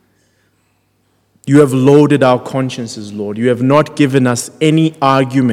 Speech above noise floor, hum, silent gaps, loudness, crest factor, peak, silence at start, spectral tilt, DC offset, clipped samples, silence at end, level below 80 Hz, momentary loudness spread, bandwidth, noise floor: 48 dB; none; none; -12 LUFS; 12 dB; 0 dBFS; 1.45 s; -6.5 dB/octave; under 0.1%; 0.5%; 0 s; -58 dBFS; 14 LU; 14.5 kHz; -59 dBFS